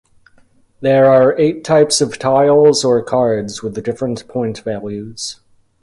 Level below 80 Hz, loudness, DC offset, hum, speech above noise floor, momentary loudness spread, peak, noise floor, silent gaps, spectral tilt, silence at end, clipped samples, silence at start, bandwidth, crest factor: -52 dBFS; -14 LUFS; under 0.1%; none; 37 dB; 14 LU; 0 dBFS; -51 dBFS; none; -4.5 dB/octave; 0.5 s; under 0.1%; 0.8 s; 11.5 kHz; 14 dB